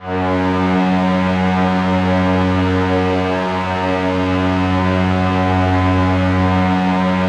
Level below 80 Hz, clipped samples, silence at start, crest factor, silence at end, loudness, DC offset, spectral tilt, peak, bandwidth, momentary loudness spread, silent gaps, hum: -40 dBFS; under 0.1%; 0 s; 12 dB; 0 s; -16 LUFS; under 0.1%; -7.5 dB/octave; -4 dBFS; 8.6 kHz; 2 LU; none; none